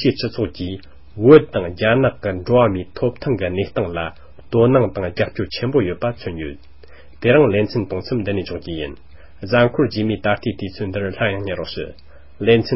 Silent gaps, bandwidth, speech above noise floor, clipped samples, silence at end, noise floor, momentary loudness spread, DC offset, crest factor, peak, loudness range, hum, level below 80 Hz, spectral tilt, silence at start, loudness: none; 5.8 kHz; 27 dB; under 0.1%; 0 s; -45 dBFS; 14 LU; 1%; 18 dB; 0 dBFS; 4 LU; none; -42 dBFS; -11 dB/octave; 0 s; -19 LUFS